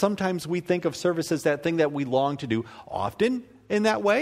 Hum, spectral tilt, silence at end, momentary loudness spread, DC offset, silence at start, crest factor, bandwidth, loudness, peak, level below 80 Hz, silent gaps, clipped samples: none; -5.5 dB/octave; 0 s; 6 LU; under 0.1%; 0 s; 18 dB; 16 kHz; -26 LUFS; -8 dBFS; -60 dBFS; none; under 0.1%